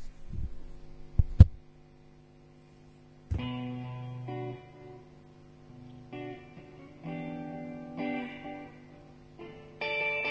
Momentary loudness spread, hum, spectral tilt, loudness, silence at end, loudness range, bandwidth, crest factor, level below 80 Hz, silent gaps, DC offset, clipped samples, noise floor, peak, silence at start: 23 LU; 50 Hz at -55 dBFS; -8.5 dB/octave; -32 LUFS; 0 s; 14 LU; 7 kHz; 32 dB; -36 dBFS; none; under 0.1%; under 0.1%; -56 dBFS; 0 dBFS; 0 s